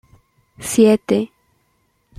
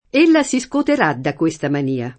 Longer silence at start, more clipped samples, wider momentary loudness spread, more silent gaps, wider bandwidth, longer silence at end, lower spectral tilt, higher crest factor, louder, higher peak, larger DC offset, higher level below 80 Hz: first, 0.6 s vs 0.15 s; neither; first, 17 LU vs 7 LU; neither; first, 15 kHz vs 8.8 kHz; first, 0.95 s vs 0.05 s; about the same, -5 dB/octave vs -5 dB/octave; about the same, 18 dB vs 16 dB; about the same, -16 LUFS vs -17 LUFS; about the same, -2 dBFS vs -2 dBFS; neither; about the same, -56 dBFS vs -54 dBFS